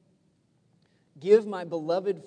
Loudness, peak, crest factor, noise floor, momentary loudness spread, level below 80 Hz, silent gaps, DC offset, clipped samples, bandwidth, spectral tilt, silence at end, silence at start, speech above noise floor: -26 LUFS; -8 dBFS; 20 dB; -68 dBFS; 11 LU; -84 dBFS; none; under 0.1%; under 0.1%; 9 kHz; -6.5 dB/octave; 0.05 s; 1.2 s; 43 dB